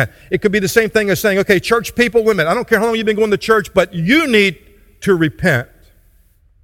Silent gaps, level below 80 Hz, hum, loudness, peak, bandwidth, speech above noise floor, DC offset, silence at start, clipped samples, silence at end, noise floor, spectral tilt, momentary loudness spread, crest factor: none; -42 dBFS; none; -14 LUFS; 0 dBFS; 17 kHz; 37 dB; under 0.1%; 0 s; under 0.1%; 1 s; -52 dBFS; -5 dB/octave; 4 LU; 16 dB